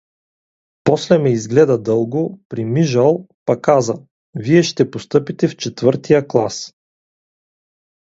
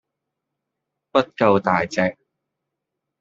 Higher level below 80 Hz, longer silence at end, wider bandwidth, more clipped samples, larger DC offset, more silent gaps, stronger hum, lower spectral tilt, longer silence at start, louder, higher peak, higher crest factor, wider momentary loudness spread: about the same, -58 dBFS vs -62 dBFS; first, 1.35 s vs 1.1 s; about the same, 8 kHz vs 7.6 kHz; neither; neither; first, 2.45-2.50 s, 3.34-3.46 s, 4.11-4.33 s vs none; neither; first, -6.5 dB/octave vs -4.5 dB/octave; second, 0.85 s vs 1.15 s; first, -16 LUFS vs -20 LUFS; about the same, 0 dBFS vs -2 dBFS; about the same, 18 dB vs 22 dB; first, 10 LU vs 5 LU